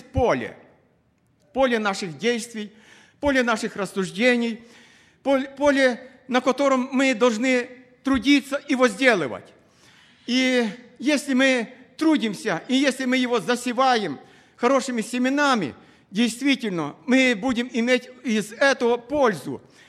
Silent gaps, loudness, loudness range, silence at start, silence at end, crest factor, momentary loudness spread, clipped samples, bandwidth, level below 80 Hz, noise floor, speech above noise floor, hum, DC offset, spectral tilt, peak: none; -22 LUFS; 3 LU; 0.15 s; 0.3 s; 20 dB; 12 LU; under 0.1%; 13.5 kHz; -52 dBFS; -64 dBFS; 42 dB; none; under 0.1%; -4 dB/octave; -2 dBFS